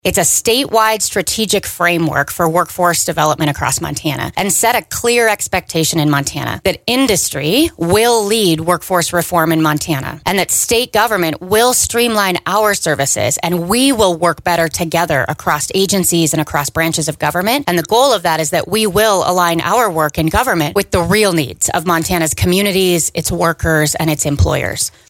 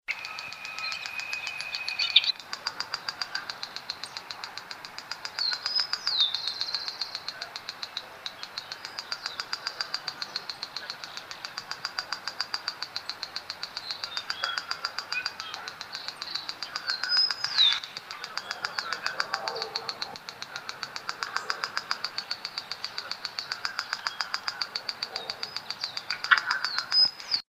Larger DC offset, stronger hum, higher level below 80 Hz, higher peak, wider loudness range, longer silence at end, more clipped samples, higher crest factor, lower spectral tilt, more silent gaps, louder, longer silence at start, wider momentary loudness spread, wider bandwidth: neither; neither; first, -36 dBFS vs -76 dBFS; about the same, 0 dBFS vs -2 dBFS; second, 1 LU vs 8 LU; about the same, 0.2 s vs 0.1 s; neither; second, 14 dB vs 30 dB; first, -3.5 dB/octave vs 0.5 dB/octave; neither; first, -14 LUFS vs -30 LUFS; about the same, 0.05 s vs 0.1 s; second, 4 LU vs 14 LU; about the same, 17 kHz vs 15.5 kHz